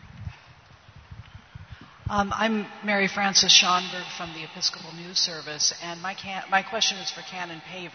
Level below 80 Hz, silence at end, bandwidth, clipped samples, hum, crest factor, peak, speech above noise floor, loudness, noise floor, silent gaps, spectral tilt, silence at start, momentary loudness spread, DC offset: -54 dBFS; 0 s; 6.6 kHz; under 0.1%; none; 26 dB; -2 dBFS; 26 dB; -23 LUFS; -52 dBFS; none; -1.5 dB/octave; 0 s; 19 LU; under 0.1%